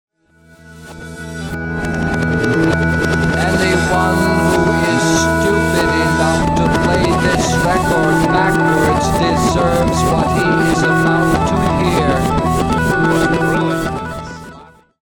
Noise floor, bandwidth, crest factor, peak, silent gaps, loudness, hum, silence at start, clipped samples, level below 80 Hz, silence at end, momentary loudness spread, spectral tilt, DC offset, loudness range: -48 dBFS; 18.5 kHz; 14 dB; -2 dBFS; none; -14 LUFS; none; 0.65 s; under 0.1%; -30 dBFS; 0.4 s; 9 LU; -5.5 dB/octave; under 0.1%; 3 LU